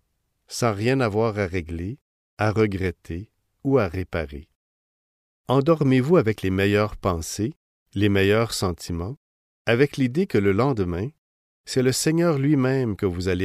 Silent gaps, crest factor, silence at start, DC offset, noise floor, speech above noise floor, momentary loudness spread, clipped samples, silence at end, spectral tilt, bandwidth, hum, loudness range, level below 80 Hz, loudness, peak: 2.01-2.37 s, 4.55-5.44 s, 7.56-7.86 s, 9.17-9.65 s, 11.18-11.64 s; 16 dB; 0.5 s; under 0.1%; -67 dBFS; 45 dB; 14 LU; under 0.1%; 0 s; -6 dB/octave; 15.5 kHz; none; 5 LU; -46 dBFS; -23 LUFS; -6 dBFS